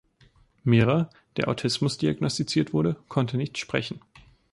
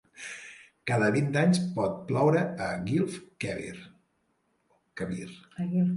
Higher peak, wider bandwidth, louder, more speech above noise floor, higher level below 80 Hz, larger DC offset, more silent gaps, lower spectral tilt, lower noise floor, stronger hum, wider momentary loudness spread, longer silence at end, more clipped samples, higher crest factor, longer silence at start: first, -8 dBFS vs -12 dBFS; about the same, 11.5 kHz vs 11.5 kHz; first, -26 LUFS vs -29 LUFS; second, 34 dB vs 46 dB; first, -56 dBFS vs -62 dBFS; neither; neither; about the same, -6 dB/octave vs -6.5 dB/octave; second, -59 dBFS vs -73 dBFS; neither; second, 9 LU vs 18 LU; first, 0.55 s vs 0 s; neither; about the same, 18 dB vs 18 dB; first, 0.65 s vs 0.15 s